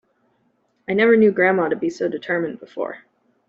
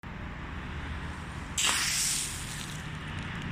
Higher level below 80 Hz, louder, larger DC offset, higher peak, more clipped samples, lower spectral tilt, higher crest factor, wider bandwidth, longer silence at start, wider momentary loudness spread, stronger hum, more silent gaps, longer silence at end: second, -68 dBFS vs -44 dBFS; first, -19 LUFS vs -31 LUFS; neither; first, -4 dBFS vs -12 dBFS; neither; first, -5 dB/octave vs -1.5 dB/octave; second, 16 dB vs 22 dB; second, 7.6 kHz vs 16 kHz; first, 0.9 s vs 0.05 s; about the same, 15 LU vs 14 LU; second, none vs 60 Hz at -50 dBFS; neither; first, 0.5 s vs 0 s